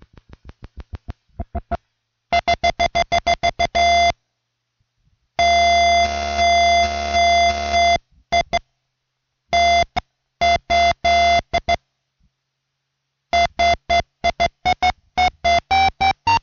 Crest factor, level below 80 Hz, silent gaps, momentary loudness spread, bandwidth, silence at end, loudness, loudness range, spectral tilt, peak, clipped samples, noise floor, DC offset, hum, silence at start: 12 dB; -36 dBFS; none; 14 LU; 7.2 kHz; 0.05 s; -17 LUFS; 5 LU; -3 dB/octave; -8 dBFS; under 0.1%; -76 dBFS; under 0.1%; none; 0.45 s